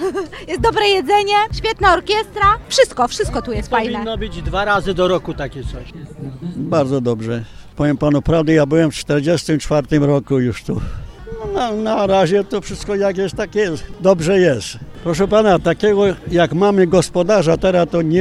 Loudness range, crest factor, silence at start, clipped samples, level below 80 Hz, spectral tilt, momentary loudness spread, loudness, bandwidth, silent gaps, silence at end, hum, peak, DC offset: 5 LU; 14 dB; 0 s; under 0.1%; -34 dBFS; -5.5 dB/octave; 12 LU; -16 LUFS; 13.5 kHz; none; 0 s; none; -2 dBFS; under 0.1%